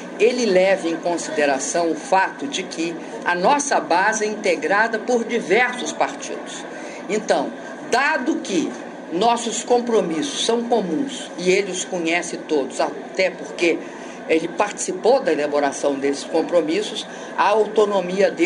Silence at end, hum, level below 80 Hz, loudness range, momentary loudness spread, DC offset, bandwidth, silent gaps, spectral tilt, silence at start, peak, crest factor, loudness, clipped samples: 0 s; none; -66 dBFS; 3 LU; 9 LU; under 0.1%; 11 kHz; none; -3 dB/octave; 0 s; -2 dBFS; 18 dB; -20 LUFS; under 0.1%